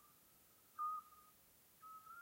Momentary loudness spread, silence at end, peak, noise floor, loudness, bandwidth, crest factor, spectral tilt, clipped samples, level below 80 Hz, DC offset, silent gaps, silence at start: 21 LU; 0 s; -38 dBFS; -70 dBFS; -49 LUFS; 16 kHz; 16 dB; -2 dB/octave; under 0.1%; -88 dBFS; under 0.1%; none; 0 s